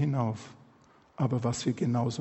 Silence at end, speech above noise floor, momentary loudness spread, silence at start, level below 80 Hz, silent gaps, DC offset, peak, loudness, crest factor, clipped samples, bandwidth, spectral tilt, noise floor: 0 s; 31 dB; 9 LU; 0 s; -64 dBFS; none; under 0.1%; -16 dBFS; -31 LUFS; 14 dB; under 0.1%; 8.4 kHz; -6.5 dB/octave; -60 dBFS